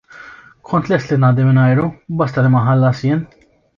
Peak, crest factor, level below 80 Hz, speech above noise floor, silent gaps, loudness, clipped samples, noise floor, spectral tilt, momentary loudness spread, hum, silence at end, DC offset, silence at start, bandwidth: -2 dBFS; 12 dB; -50 dBFS; 25 dB; none; -15 LUFS; under 0.1%; -39 dBFS; -9 dB/octave; 8 LU; none; 0.5 s; under 0.1%; 0.15 s; 7 kHz